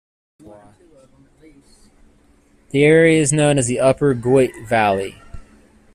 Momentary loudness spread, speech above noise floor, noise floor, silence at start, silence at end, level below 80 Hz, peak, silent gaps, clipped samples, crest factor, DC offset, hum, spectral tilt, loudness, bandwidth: 9 LU; 39 dB; -54 dBFS; 2.75 s; 0.55 s; -48 dBFS; -2 dBFS; none; under 0.1%; 16 dB; under 0.1%; none; -5 dB/octave; -16 LUFS; 14 kHz